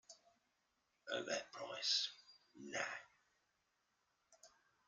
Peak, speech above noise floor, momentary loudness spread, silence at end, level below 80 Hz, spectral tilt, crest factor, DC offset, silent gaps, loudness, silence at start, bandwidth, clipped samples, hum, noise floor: -26 dBFS; 41 dB; 24 LU; 0.4 s; under -90 dBFS; -0.5 dB/octave; 24 dB; under 0.1%; none; -43 LUFS; 0.1 s; 11.5 kHz; under 0.1%; none; -84 dBFS